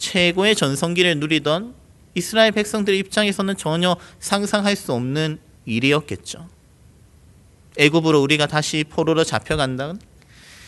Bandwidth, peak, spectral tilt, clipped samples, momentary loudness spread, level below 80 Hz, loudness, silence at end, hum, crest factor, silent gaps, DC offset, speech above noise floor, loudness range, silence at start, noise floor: 12 kHz; 0 dBFS; -4.5 dB/octave; under 0.1%; 14 LU; -50 dBFS; -19 LUFS; 0 s; none; 20 dB; none; under 0.1%; 31 dB; 4 LU; 0 s; -50 dBFS